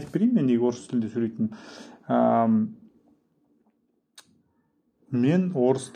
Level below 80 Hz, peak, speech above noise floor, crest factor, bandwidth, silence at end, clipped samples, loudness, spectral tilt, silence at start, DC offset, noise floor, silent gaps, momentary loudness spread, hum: -72 dBFS; -10 dBFS; 46 dB; 16 dB; 10 kHz; 0.05 s; under 0.1%; -24 LUFS; -8 dB/octave; 0 s; under 0.1%; -70 dBFS; none; 11 LU; none